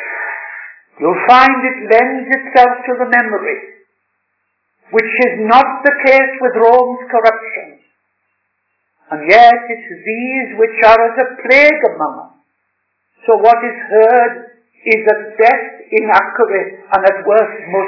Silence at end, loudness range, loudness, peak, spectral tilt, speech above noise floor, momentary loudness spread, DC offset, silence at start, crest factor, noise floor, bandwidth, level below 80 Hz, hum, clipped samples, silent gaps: 0 s; 3 LU; -11 LUFS; 0 dBFS; -5 dB/octave; 56 dB; 15 LU; under 0.1%; 0 s; 12 dB; -67 dBFS; 5.4 kHz; -54 dBFS; none; 1%; none